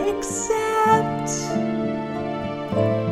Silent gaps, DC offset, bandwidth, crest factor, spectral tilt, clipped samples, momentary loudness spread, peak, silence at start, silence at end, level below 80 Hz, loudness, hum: none; under 0.1%; 16 kHz; 16 dB; -5 dB/octave; under 0.1%; 9 LU; -6 dBFS; 0 s; 0 s; -50 dBFS; -23 LUFS; none